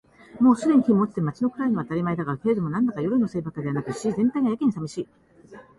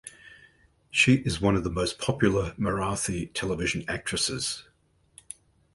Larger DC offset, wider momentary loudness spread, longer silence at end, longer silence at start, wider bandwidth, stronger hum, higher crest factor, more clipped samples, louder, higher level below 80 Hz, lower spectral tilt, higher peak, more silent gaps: neither; second, 10 LU vs 20 LU; second, 0.15 s vs 1.15 s; first, 0.35 s vs 0.05 s; about the same, 11.5 kHz vs 12 kHz; neither; second, 16 dB vs 22 dB; neither; about the same, -24 LUFS vs -26 LUFS; second, -60 dBFS vs -46 dBFS; first, -8 dB/octave vs -4.5 dB/octave; about the same, -6 dBFS vs -8 dBFS; neither